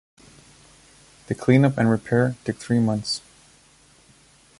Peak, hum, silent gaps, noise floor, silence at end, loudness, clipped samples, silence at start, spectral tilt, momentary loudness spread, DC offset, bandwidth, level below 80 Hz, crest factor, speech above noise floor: -4 dBFS; none; none; -55 dBFS; 1.4 s; -22 LUFS; under 0.1%; 1.3 s; -6.5 dB/octave; 12 LU; under 0.1%; 11.5 kHz; -56 dBFS; 20 dB; 35 dB